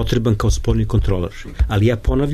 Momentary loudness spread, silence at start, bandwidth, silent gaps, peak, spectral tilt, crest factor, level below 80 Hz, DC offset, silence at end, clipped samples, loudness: 6 LU; 0 s; 13.5 kHz; none; -4 dBFS; -6.5 dB/octave; 14 dB; -22 dBFS; under 0.1%; 0 s; under 0.1%; -19 LUFS